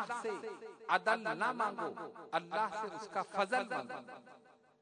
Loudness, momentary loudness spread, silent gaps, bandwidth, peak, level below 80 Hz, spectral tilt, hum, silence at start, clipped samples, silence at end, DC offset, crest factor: -37 LUFS; 14 LU; none; 10.5 kHz; -16 dBFS; -88 dBFS; -4 dB/octave; none; 0 s; under 0.1%; 0.45 s; under 0.1%; 24 dB